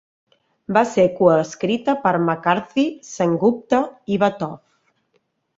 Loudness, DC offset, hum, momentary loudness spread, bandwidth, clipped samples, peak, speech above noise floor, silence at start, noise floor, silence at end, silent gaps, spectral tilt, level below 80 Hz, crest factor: -19 LUFS; under 0.1%; none; 8 LU; 7.8 kHz; under 0.1%; -2 dBFS; 49 dB; 0.7 s; -67 dBFS; 1 s; none; -6 dB/octave; -60 dBFS; 20 dB